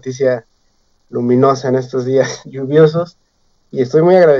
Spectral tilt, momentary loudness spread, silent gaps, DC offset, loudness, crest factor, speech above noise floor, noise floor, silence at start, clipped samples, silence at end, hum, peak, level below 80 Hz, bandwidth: -7 dB/octave; 14 LU; none; under 0.1%; -14 LUFS; 14 dB; 45 dB; -57 dBFS; 0.05 s; under 0.1%; 0 s; none; 0 dBFS; -60 dBFS; 7.4 kHz